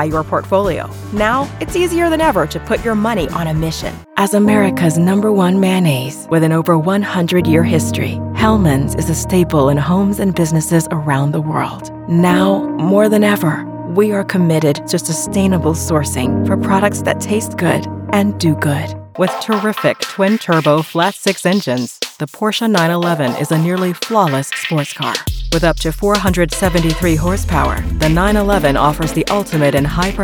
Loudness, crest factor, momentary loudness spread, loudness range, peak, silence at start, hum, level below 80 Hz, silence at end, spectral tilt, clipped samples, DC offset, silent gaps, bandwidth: -15 LUFS; 14 dB; 6 LU; 2 LU; 0 dBFS; 0 s; none; -30 dBFS; 0 s; -5.5 dB/octave; under 0.1%; under 0.1%; none; over 20 kHz